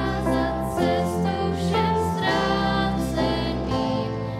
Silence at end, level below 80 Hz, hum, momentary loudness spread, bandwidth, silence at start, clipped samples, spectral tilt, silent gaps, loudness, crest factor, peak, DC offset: 0 s; -38 dBFS; none; 3 LU; 15.5 kHz; 0 s; under 0.1%; -6 dB/octave; none; -23 LUFS; 14 dB; -8 dBFS; under 0.1%